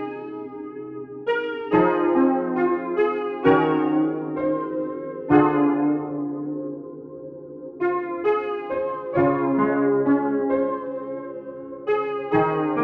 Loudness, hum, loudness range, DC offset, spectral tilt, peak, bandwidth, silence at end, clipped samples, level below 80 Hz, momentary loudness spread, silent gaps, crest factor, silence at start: -23 LUFS; none; 4 LU; under 0.1%; -9.5 dB/octave; -2 dBFS; 4.6 kHz; 0 s; under 0.1%; -62 dBFS; 16 LU; none; 20 dB; 0 s